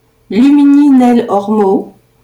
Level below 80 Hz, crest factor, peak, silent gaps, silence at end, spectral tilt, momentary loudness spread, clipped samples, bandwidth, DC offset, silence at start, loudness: -52 dBFS; 8 dB; -2 dBFS; none; 0.35 s; -7.5 dB/octave; 8 LU; under 0.1%; 10.5 kHz; under 0.1%; 0.3 s; -9 LUFS